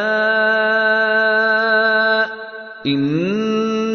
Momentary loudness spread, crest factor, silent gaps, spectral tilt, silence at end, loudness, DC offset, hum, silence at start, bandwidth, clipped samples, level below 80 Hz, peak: 8 LU; 14 dB; none; -5.5 dB/octave; 0 s; -16 LUFS; under 0.1%; none; 0 s; 6.6 kHz; under 0.1%; -62 dBFS; -4 dBFS